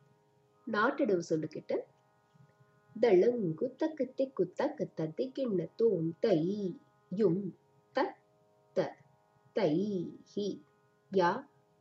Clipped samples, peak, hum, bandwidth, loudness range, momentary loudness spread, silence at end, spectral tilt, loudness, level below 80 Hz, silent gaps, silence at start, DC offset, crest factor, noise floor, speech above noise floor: under 0.1%; -14 dBFS; none; 7.8 kHz; 4 LU; 10 LU; 0.35 s; -7.5 dB/octave; -33 LUFS; -84 dBFS; none; 0.65 s; under 0.1%; 18 dB; -69 dBFS; 37 dB